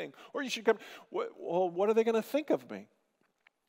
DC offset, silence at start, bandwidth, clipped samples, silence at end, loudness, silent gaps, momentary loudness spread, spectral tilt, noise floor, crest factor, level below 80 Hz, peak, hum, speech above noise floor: under 0.1%; 0 s; 16 kHz; under 0.1%; 0.85 s; -32 LUFS; none; 12 LU; -4.5 dB/octave; -76 dBFS; 20 dB; under -90 dBFS; -14 dBFS; none; 44 dB